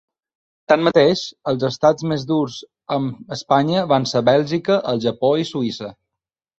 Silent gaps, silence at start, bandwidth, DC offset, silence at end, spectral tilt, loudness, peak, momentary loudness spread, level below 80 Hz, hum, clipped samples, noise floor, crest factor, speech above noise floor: none; 0.7 s; 8 kHz; under 0.1%; 0.65 s; -6 dB/octave; -19 LUFS; -2 dBFS; 10 LU; -58 dBFS; none; under 0.1%; -85 dBFS; 18 dB; 67 dB